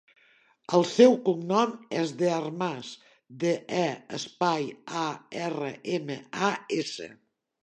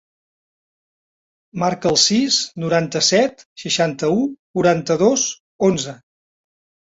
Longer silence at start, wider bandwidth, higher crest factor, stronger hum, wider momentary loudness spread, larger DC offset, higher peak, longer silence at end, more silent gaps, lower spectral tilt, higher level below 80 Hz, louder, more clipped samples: second, 0.7 s vs 1.55 s; first, 10 kHz vs 8 kHz; about the same, 22 dB vs 20 dB; neither; first, 15 LU vs 9 LU; neither; second, -6 dBFS vs 0 dBFS; second, 0.5 s vs 1 s; second, none vs 3.45-3.56 s, 4.39-4.54 s, 5.40-5.59 s; first, -5 dB/octave vs -3.5 dB/octave; second, -78 dBFS vs -58 dBFS; second, -27 LUFS vs -18 LUFS; neither